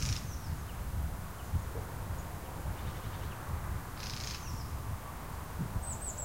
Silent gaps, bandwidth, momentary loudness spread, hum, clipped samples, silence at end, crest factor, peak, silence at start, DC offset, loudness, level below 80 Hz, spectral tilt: none; 16 kHz; 4 LU; none; under 0.1%; 0 s; 18 dB; -20 dBFS; 0 s; 0.2%; -40 LUFS; -42 dBFS; -4.5 dB/octave